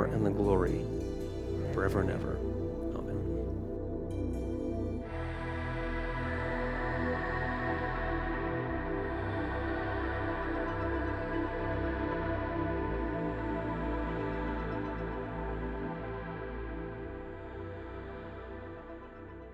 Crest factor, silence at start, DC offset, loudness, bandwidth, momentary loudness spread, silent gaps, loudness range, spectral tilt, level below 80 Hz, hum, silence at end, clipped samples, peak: 20 dB; 0 s; under 0.1%; -35 LUFS; 12 kHz; 11 LU; none; 5 LU; -8 dB/octave; -42 dBFS; none; 0 s; under 0.1%; -14 dBFS